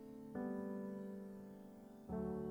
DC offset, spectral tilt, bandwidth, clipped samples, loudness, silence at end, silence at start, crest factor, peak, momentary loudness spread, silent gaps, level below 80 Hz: under 0.1%; -9 dB/octave; 18 kHz; under 0.1%; -48 LUFS; 0 s; 0 s; 12 dB; -34 dBFS; 12 LU; none; -68 dBFS